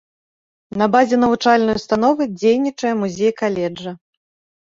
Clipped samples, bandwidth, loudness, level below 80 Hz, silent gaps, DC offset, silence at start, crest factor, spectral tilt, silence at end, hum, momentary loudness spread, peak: under 0.1%; 7.6 kHz; -17 LUFS; -54 dBFS; none; under 0.1%; 0.75 s; 16 dB; -5.5 dB/octave; 0.75 s; none; 10 LU; -2 dBFS